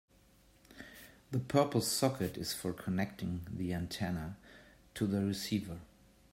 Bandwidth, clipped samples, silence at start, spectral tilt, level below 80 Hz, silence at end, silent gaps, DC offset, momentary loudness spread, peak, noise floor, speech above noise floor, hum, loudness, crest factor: 16 kHz; under 0.1%; 0.7 s; -5 dB/octave; -62 dBFS; 0.45 s; none; under 0.1%; 20 LU; -14 dBFS; -65 dBFS; 30 dB; none; -36 LUFS; 22 dB